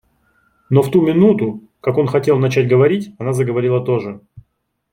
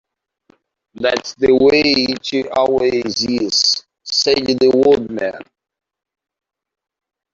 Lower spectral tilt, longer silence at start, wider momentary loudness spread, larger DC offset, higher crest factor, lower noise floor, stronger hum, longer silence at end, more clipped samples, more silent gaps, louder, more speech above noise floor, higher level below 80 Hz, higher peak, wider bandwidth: first, -8 dB/octave vs -3 dB/octave; second, 0.7 s vs 1 s; about the same, 9 LU vs 10 LU; neither; about the same, 14 dB vs 16 dB; first, -67 dBFS vs -57 dBFS; neither; second, 0.5 s vs 1.9 s; neither; neither; about the same, -16 LUFS vs -15 LUFS; first, 52 dB vs 43 dB; about the same, -56 dBFS vs -52 dBFS; about the same, -2 dBFS vs -2 dBFS; first, 16 kHz vs 7.6 kHz